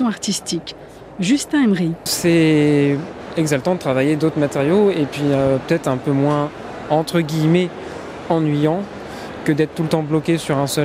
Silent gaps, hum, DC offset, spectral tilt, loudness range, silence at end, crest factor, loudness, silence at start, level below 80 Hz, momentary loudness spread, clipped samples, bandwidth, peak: none; none; under 0.1%; -6 dB/octave; 3 LU; 0 s; 16 dB; -18 LUFS; 0 s; -50 dBFS; 11 LU; under 0.1%; 15.5 kHz; -2 dBFS